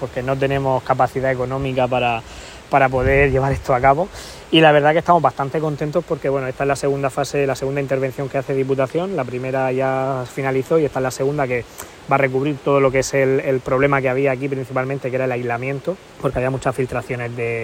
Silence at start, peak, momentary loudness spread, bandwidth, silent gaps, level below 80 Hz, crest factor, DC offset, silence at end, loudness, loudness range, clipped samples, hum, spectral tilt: 0 s; 0 dBFS; 8 LU; 16 kHz; none; -40 dBFS; 18 dB; under 0.1%; 0 s; -19 LUFS; 5 LU; under 0.1%; none; -6 dB/octave